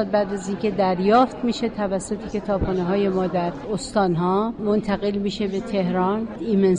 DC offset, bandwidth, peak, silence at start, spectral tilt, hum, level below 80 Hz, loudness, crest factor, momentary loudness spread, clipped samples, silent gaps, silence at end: under 0.1%; 10 kHz; -6 dBFS; 0 s; -6.5 dB/octave; none; -44 dBFS; -22 LUFS; 16 dB; 8 LU; under 0.1%; none; 0 s